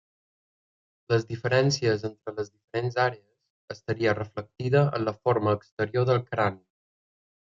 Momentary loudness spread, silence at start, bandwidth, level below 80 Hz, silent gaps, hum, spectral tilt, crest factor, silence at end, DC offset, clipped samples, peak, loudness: 12 LU; 1.1 s; 7.6 kHz; -66 dBFS; 2.64-2.68 s, 3.50-3.68 s, 5.72-5.77 s; none; -6 dB/octave; 20 dB; 0.95 s; under 0.1%; under 0.1%; -8 dBFS; -27 LUFS